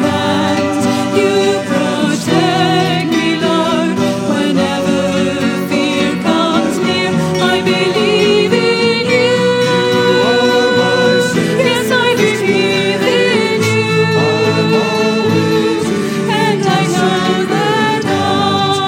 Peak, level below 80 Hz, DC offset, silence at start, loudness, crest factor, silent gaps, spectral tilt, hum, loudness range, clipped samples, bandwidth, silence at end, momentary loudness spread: 0 dBFS; -54 dBFS; under 0.1%; 0 s; -13 LUFS; 12 dB; none; -5 dB/octave; none; 2 LU; under 0.1%; 16.5 kHz; 0 s; 3 LU